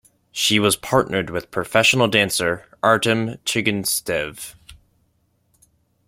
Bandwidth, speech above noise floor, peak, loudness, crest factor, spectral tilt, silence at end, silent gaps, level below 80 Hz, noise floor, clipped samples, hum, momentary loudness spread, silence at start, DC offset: 16.5 kHz; 45 dB; -2 dBFS; -19 LUFS; 20 dB; -3 dB/octave; 1.35 s; none; -54 dBFS; -65 dBFS; under 0.1%; none; 10 LU; 0.35 s; under 0.1%